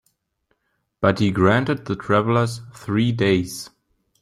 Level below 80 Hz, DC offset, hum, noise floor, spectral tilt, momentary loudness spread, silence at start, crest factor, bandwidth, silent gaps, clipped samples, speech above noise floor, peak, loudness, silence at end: -54 dBFS; under 0.1%; none; -72 dBFS; -6.5 dB/octave; 13 LU; 1 s; 18 dB; 14 kHz; none; under 0.1%; 52 dB; -2 dBFS; -20 LUFS; 0.55 s